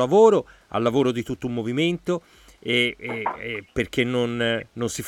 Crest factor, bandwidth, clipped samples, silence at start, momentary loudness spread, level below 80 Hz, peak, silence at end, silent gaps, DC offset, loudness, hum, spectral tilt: 18 dB; 14.5 kHz; under 0.1%; 0 s; 11 LU; -52 dBFS; -4 dBFS; 0 s; none; under 0.1%; -23 LUFS; none; -5 dB/octave